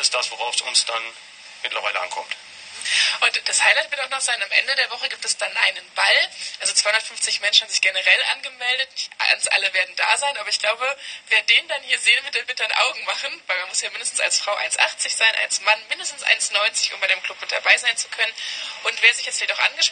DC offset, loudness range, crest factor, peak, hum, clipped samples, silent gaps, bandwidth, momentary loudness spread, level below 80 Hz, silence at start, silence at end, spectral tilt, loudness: under 0.1%; 2 LU; 22 dB; 0 dBFS; none; under 0.1%; none; 10 kHz; 9 LU; -76 dBFS; 0 s; 0 s; 3.5 dB/octave; -19 LUFS